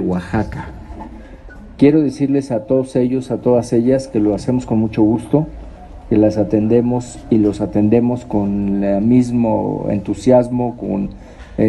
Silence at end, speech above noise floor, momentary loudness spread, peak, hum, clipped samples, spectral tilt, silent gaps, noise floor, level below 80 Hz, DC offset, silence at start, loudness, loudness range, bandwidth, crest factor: 0 s; 20 dB; 13 LU; 0 dBFS; none; under 0.1%; -8.5 dB/octave; none; -36 dBFS; -38 dBFS; under 0.1%; 0 s; -16 LUFS; 1 LU; 11 kHz; 16 dB